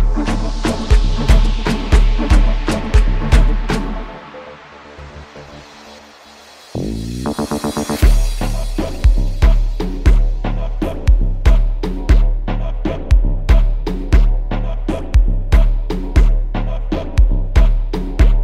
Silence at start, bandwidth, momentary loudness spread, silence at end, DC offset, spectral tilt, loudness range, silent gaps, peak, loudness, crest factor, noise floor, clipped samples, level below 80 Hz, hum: 0 s; 11.5 kHz; 17 LU; 0 s; under 0.1%; -6.5 dB/octave; 9 LU; none; 0 dBFS; -18 LUFS; 14 dB; -41 dBFS; under 0.1%; -14 dBFS; none